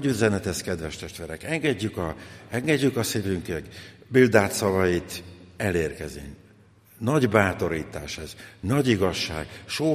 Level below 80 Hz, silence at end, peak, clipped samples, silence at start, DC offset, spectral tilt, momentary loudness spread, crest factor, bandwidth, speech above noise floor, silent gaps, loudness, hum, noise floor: -50 dBFS; 0 s; -2 dBFS; under 0.1%; 0 s; under 0.1%; -5 dB/octave; 16 LU; 22 dB; 15.5 kHz; 29 dB; none; -25 LUFS; none; -54 dBFS